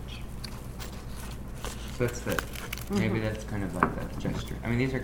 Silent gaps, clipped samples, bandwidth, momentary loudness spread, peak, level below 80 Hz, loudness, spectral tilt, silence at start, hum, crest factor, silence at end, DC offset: none; under 0.1%; over 20 kHz; 12 LU; -6 dBFS; -40 dBFS; -33 LUFS; -5.5 dB/octave; 0 s; none; 26 dB; 0 s; under 0.1%